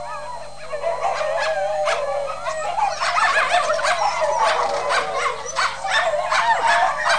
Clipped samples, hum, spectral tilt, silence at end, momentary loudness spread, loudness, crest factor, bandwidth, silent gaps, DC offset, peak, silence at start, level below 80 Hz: under 0.1%; 50 Hz at -50 dBFS; -0.5 dB/octave; 0 s; 9 LU; -20 LUFS; 16 dB; 10.5 kHz; none; 2%; -6 dBFS; 0 s; -52 dBFS